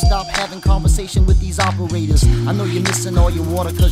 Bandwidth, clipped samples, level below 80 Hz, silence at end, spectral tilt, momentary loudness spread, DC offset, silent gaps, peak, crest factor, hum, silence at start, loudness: 15.5 kHz; under 0.1%; -18 dBFS; 0 s; -5 dB/octave; 4 LU; under 0.1%; none; -2 dBFS; 12 dB; none; 0 s; -17 LUFS